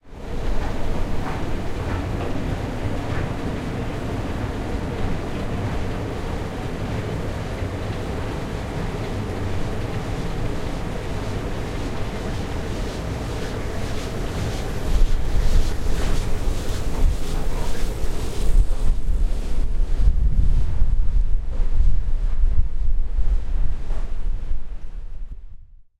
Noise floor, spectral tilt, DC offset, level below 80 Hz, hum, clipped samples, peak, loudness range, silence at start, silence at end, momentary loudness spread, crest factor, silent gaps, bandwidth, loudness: -39 dBFS; -6.5 dB/octave; under 0.1%; -22 dBFS; none; under 0.1%; -4 dBFS; 3 LU; 0.05 s; 0.35 s; 5 LU; 14 dB; none; 11 kHz; -27 LUFS